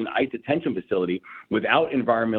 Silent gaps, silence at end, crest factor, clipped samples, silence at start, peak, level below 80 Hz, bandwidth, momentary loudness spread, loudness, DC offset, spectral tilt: none; 0 s; 18 dB; under 0.1%; 0 s; -6 dBFS; -60 dBFS; 4.4 kHz; 7 LU; -24 LUFS; under 0.1%; -8.5 dB/octave